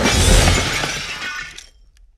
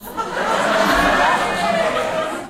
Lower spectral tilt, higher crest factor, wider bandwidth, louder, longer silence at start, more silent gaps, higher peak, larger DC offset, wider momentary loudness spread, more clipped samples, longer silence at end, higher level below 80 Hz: about the same, -3 dB/octave vs -3.5 dB/octave; about the same, 18 dB vs 14 dB; about the same, 15 kHz vs 16.5 kHz; about the same, -17 LUFS vs -17 LUFS; about the same, 0 s vs 0 s; neither; first, 0 dBFS vs -4 dBFS; neither; first, 15 LU vs 7 LU; neither; first, 0.6 s vs 0 s; first, -22 dBFS vs -40 dBFS